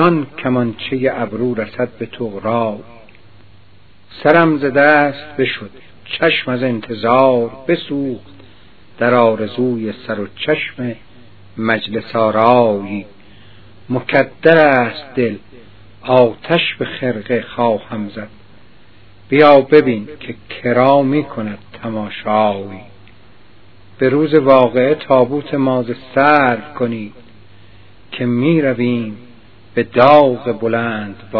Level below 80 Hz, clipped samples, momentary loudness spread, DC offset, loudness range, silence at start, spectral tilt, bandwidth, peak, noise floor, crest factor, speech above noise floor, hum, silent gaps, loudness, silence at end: -54 dBFS; 0.1%; 16 LU; 0.9%; 5 LU; 0 s; -9 dB/octave; 5.4 kHz; 0 dBFS; -48 dBFS; 16 dB; 34 dB; none; none; -15 LUFS; 0 s